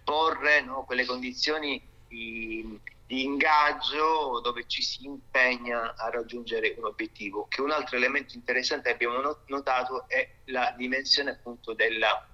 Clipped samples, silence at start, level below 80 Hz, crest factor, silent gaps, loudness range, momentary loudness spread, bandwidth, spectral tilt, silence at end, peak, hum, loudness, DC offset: under 0.1%; 0.05 s; -58 dBFS; 20 dB; none; 3 LU; 12 LU; 12.5 kHz; -2 dB/octave; 0.1 s; -10 dBFS; none; -27 LUFS; under 0.1%